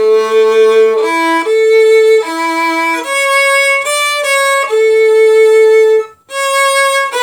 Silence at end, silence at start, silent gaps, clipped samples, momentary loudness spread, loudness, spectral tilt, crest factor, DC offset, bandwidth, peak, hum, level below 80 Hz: 0 s; 0 s; none; under 0.1%; 6 LU; -9 LUFS; 0 dB/octave; 8 dB; under 0.1%; 19 kHz; 0 dBFS; none; -68 dBFS